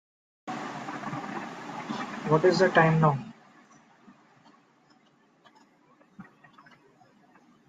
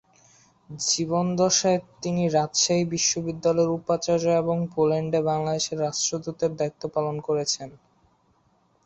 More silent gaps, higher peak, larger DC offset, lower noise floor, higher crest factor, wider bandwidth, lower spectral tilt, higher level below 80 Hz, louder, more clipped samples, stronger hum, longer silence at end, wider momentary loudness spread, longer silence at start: neither; first, -6 dBFS vs -10 dBFS; neither; about the same, -63 dBFS vs -65 dBFS; first, 24 dB vs 16 dB; about the same, 7.8 kHz vs 8.2 kHz; first, -6.5 dB/octave vs -4 dB/octave; second, -70 dBFS vs -62 dBFS; second, -27 LUFS vs -24 LUFS; neither; neither; first, 1.45 s vs 1.1 s; first, 18 LU vs 7 LU; second, 0.45 s vs 0.7 s